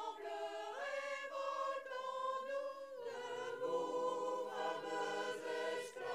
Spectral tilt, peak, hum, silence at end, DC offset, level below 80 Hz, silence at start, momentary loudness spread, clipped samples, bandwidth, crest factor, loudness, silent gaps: -2.5 dB/octave; -28 dBFS; none; 0 s; under 0.1%; under -90 dBFS; 0 s; 6 LU; under 0.1%; 15.5 kHz; 14 dB; -43 LUFS; none